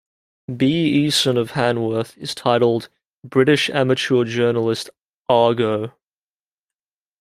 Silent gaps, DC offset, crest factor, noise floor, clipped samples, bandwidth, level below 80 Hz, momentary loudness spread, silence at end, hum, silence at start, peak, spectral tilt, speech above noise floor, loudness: 3.06-3.20 s, 5.04-5.22 s; under 0.1%; 18 dB; under -90 dBFS; under 0.1%; 15.5 kHz; -60 dBFS; 11 LU; 1.3 s; none; 0.5 s; -2 dBFS; -5 dB/octave; over 72 dB; -19 LUFS